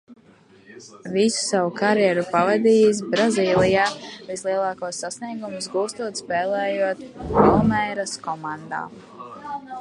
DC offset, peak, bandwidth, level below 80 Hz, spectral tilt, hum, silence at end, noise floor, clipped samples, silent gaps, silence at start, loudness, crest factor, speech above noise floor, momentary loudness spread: under 0.1%; -2 dBFS; 11.5 kHz; -48 dBFS; -4.5 dB/octave; none; 0 s; -52 dBFS; under 0.1%; none; 0.1 s; -21 LUFS; 20 dB; 31 dB; 16 LU